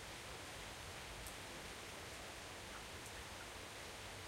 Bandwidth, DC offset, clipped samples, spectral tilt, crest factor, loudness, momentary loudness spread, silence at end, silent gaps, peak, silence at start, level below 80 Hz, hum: 16 kHz; under 0.1%; under 0.1%; -2.5 dB/octave; 18 dB; -50 LUFS; 1 LU; 0 s; none; -34 dBFS; 0 s; -62 dBFS; none